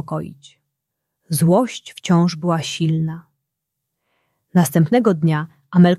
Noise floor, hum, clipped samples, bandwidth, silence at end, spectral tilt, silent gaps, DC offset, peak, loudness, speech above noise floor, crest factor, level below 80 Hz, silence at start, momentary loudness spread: -79 dBFS; none; under 0.1%; 14.5 kHz; 0 s; -6.5 dB/octave; none; under 0.1%; -2 dBFS; -18 LUFS; 62 dB; 16 dB; -60 dBFS; 0.05 s; 12 LU